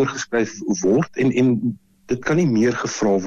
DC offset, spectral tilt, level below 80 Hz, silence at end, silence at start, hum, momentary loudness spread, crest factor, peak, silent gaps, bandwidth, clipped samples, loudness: under 0.1%; -6 dB/octave; -52 dBFS; 0 s; 0 s; none; 8 LU; 10 dB; -10 dBFS; none; 7.8 kHz; under 0.1%; -20 LUFS